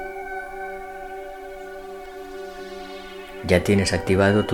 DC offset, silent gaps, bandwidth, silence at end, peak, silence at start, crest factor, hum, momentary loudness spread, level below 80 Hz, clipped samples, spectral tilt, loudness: under 0.1%; none; 17.5 kHz; 0 s; -2 dBFS; 0 s; 24 dB; none; 18 LU; -46 dBFS; under 0.1%; -5.5 dB/octave; -23 LUFS